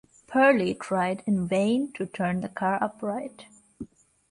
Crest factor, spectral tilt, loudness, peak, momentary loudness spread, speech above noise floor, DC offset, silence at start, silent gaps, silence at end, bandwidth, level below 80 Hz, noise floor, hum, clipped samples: 20 dB; -6.5 dB/octave; -26 LUFS; -8 dBFS; 21 LU; 19 dB; under 0.1%; 0.3 s; none; 0.45 s; 11.5 kHz; -62 dBFS; -44 dBFS; none; under 0.1%